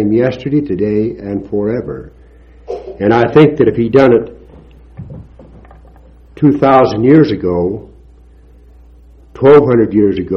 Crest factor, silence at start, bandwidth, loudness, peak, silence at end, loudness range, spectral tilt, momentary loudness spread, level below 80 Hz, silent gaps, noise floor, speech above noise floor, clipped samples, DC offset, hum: 12 dB; 0 s; 6.6 kHz; -11 LUFS; 0 dBFS; 0 s; 2 LU; -9 dB/octave; 19 LU; -40 dBFS; none; -41 dBFS; 30 dB; 0.4%; under 0.1%; none